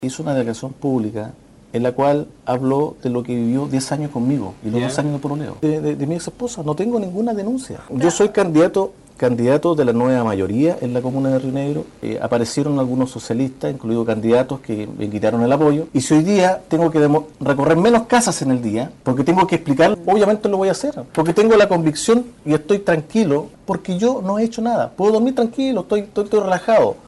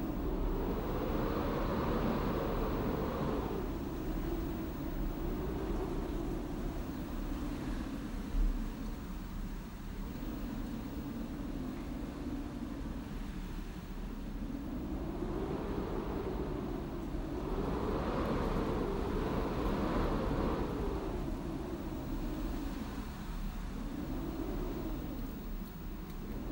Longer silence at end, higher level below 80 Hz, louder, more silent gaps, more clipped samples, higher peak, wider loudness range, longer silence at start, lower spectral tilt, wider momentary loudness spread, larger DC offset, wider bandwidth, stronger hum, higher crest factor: about the same, 0.1 s vs 0 s; second, -50 dBFS vs -42 dBFS; first, -18 LUFS vs -39 LUFS; neither; neither; first, -4 dBFS vs -22 dBFS; about the same, 5 LU vs 7 LU; about the same, 0 s vs 0 s; about the same, -6 dB/octave vs -7 dB/octave; about the same, 9 LU vs 9 LU; neither; second, 11.5 kHz vs 16 kHz; neither; about the same, 12 dB vs 16 dB